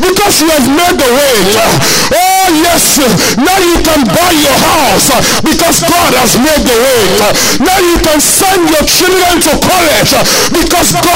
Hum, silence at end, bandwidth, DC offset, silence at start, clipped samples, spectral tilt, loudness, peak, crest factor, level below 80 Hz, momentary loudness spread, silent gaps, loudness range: none; 0 s; 16.5 kHz; under 0.1%; 0 s; under 0.1%; -2.5 dB/octave; -6 LUFS; 0 dBFS; 6 dB; -26 dBFS; 2 LU; none; 0 LU